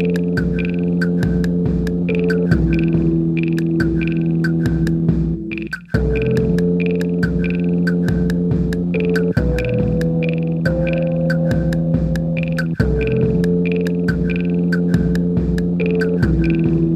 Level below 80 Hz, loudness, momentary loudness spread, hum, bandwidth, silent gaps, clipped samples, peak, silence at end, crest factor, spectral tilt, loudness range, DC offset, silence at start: -28 dBFS; -18 LUFS; 3 LU; none; 8.2 kHz; none; under 0.1%; -2 dBFS; 0 s; 14 dB; -9 dB/octave; 1 LU; under 0.1%; 0 s